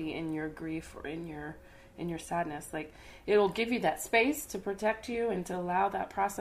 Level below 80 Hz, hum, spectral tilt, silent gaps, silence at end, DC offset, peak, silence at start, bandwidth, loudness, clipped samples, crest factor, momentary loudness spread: -58 dBFS; none; -4.5 dB/octave; none; 0 s; under 0.1%; -12 dBFS; 0 s; 15.5 kHz; -33 LUFS; under 0.1%; 22 dB; 14 LU